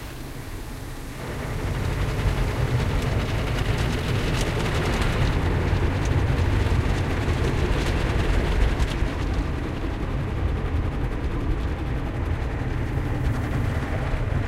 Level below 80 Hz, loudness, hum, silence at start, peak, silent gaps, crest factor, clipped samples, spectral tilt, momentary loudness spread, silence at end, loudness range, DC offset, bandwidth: -28 dBFS; -26 LUFS; none; 0 s; -6 dBFS; none; 16 dB; under 0.1%; -6.5 dB/octave; 6 LU; 0 s; 4 LU; under 0.1%; 15.5 kHz